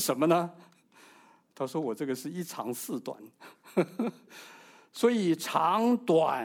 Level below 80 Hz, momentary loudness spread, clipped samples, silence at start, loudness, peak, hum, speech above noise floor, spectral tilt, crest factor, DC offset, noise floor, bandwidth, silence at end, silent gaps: -84 dBFS; 21 LU; under 0.1%; 0 s; -29 LUFS; -10 dBFS; none; 30 dB; -5 dB/octave; 20 dB; under 0.1%; -59 dBFS; 19.5 kHz; 0 s; none